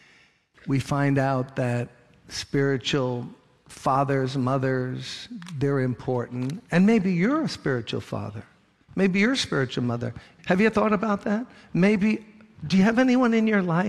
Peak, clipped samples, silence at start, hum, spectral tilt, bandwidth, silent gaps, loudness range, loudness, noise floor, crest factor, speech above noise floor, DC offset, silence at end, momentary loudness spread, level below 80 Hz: -8 dBFS; under 0.1%; 0.65 s; none; -6.5 dB/octave; 12 kHz; none; 4 LU; -24 LUFS; -59 dBFS; 16 dB; 35 dB; under 0.1%; 0 s; 14 LU; -56 dBFS